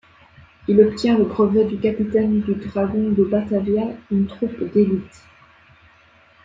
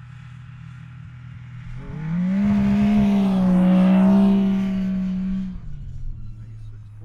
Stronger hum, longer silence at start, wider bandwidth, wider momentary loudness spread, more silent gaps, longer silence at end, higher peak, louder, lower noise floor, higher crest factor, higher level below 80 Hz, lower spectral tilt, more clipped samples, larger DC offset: neither; first, 0.7 s vs 0 s; first, 7.6 kHz vs 5.6 kHz; second, 8 LU vs 24 LU; neither; first, 1.35 s vs 0 s; first, -2 dBFS vs -8 dBFS; about the same, -19 LUFS vs -19 LUFS; first, -53 dBFS vs -39 dBFS; about the same, 18 dB vs 14 dB; second, -52 dBFS vs -38 dBFS; about the same, -8.5 dB/octave vs -9.5 dB/octave; neither; neither